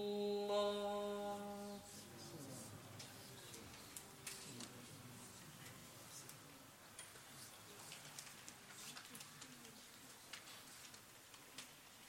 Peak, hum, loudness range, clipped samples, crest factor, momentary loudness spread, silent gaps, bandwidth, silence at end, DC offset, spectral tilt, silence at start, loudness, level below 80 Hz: -28 dBFS; none; 9 LU; under 0.1%; 22 dB; 15 LU; none; 16.5 kHz; 0 s; under 0.1%; -3.5 dB/octave; 0 s; -51 LUFS; -80 dBFS